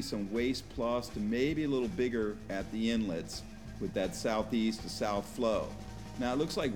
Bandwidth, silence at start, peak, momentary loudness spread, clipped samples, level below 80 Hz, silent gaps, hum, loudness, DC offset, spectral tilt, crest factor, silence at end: 18.5 kHz; 0 s; -18 dBFS; 9 LU; under 0.1%; -52 dBFS; none; none; -34 LUFS; 0.2%; -5.5 dB/octave; 16 dB; 0 s